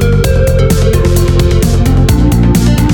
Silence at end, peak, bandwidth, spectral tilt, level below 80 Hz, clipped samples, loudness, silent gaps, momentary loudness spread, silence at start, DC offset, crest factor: 0 s; 0 dBFS; 19.5 kHz; -6.5 dB/octave; -12 dBFS; under 0.1%; -9 LUFS; none; 1 LU; 0 s; 0.5%; 8 dB